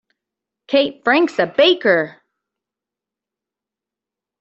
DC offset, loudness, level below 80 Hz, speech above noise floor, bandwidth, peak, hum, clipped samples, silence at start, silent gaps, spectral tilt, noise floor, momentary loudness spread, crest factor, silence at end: under 0.1%; -16 LUFS; -66 dBFS; 71 dB; 8 kHz; -2 dBFS; none; under 0.1%; 0.7 s; none; -5 dB/octave; -87 dBFS; 5 LU; 18 dB; 2.3 s